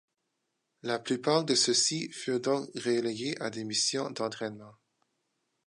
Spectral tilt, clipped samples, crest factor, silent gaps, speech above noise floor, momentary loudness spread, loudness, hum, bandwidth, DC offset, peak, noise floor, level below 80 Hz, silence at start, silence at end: -3 dB/octave; under 0.1%; 20 dB; none; 51 dB; 11 LU; -30 LUFS; none; 11.5 kHz; under 0.1%; -12 dBFS; -82 dBFS; -80 dBFS; 0.85 s; 0.95 s